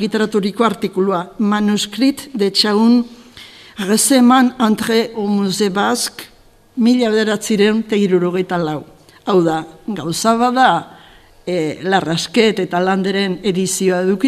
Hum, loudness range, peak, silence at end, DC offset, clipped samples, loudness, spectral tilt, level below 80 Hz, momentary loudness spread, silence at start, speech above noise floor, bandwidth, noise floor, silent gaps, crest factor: none; 3 LU; 0 dBFS; 0 s; under 0.1%; under 0.1%; -15 LUFS; -4.5 dB/octave; -54 dBFS; 10 LU; 0 s; 29 dB; 15 kHz; -44 dBFS; none; 16 dB